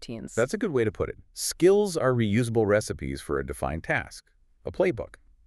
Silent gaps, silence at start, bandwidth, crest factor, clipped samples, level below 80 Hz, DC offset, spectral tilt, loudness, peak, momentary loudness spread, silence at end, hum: none; 0 s; 13.5 kHz; 18 dB; under 0.1%; -48 dBFS; under 0.1%; -5.5 dB/octave; -26 LUFS; -10 dBFS; 13 LU; 0.4 s; none